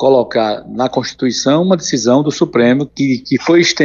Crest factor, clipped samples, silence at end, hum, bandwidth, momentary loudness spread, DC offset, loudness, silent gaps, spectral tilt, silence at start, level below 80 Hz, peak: 12 dB; under 0.1%; 0 s; none; 7.6 kHz; 6 LU; under 0.1%; -14 LUFS; none; -4.5 dB/octave; 0 s; -52 dBFS; 0 dBFS